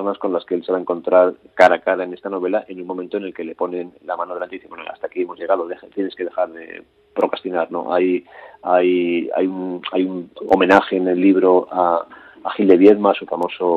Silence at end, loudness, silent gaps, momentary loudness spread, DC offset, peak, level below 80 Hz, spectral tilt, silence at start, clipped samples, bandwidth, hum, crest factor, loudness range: 0 s; -18 LUFS; none; 16 LU; under 0.1%; 0 dBFS; -64 dBFS; -7 dB/octave; 0 s; under 0.1%; 8 kHz; none; 18 dB; 10 LU